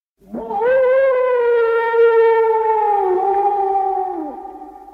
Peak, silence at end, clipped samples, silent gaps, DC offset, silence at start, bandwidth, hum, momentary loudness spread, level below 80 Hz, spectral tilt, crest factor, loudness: -4 dBFS; 0.05 s; under 0.1%; none; under 0.1%; 0.3 s; 4.5 kHz; none; 17 LU; -56 dBFS; -6 dB/octave; 12 dB; -16 LUFS